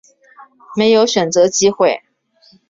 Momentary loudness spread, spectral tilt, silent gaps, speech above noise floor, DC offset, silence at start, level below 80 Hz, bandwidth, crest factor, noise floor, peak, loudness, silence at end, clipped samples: 9 LU; -3.5 dB/octave; none; 39 dB; under 0.1%; 0.7 s; -58 dBFS; 7.8 kHz; 14 dB; -53 dBFS; -2 dBFS; -13 LUFS; 0.7 s; under 0.1%